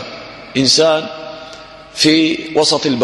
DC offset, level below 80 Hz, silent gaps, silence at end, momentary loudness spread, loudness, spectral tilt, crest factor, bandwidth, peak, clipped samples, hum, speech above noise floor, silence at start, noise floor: under 0.1%; -52 dBFS; none; 0 s; 21 LU; -13 LUFS; -3 dB/octave; 16 dB; 12 kHz; 0 dBFS; under 0.1%; none; 22 dB; 0 s; -35 dBFS